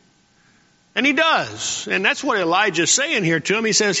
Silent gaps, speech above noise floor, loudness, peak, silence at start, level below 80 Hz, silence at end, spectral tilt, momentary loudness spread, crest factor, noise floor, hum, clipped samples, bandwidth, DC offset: none; 38 dB; -18 LUFS; -2 dBFS; 0.95 s; -64 dBFS; 0 s; -2 dB/octave; 5 LU; 18 dB; -57 dBFS; none; under 0.1%; 8.2 kHz; under 0.1%